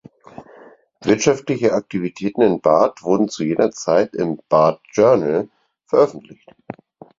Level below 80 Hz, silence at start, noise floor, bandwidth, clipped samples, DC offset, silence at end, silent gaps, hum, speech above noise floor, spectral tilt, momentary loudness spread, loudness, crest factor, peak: -58 dBFS; 0.4 s; -46 dBFS; 7.8 kHz; under 0.1%; under 0.1%; 0.45 s; none; none; 29 dB; -5.5 dB/octave; 11 LU; -18 LUFS; 18 dB; -2 dBFS